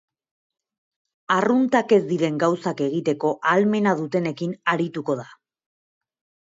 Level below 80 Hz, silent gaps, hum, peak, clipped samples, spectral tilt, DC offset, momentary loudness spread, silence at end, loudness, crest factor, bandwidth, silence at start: -72 dBFS; none; none; -6 dBFS; under 0.1%; -6.5 dB/octave; under 0.1%; 7 LU; 1.15 s; -22 LUFS; 18 dB; 7.8 kHz; 1.3 s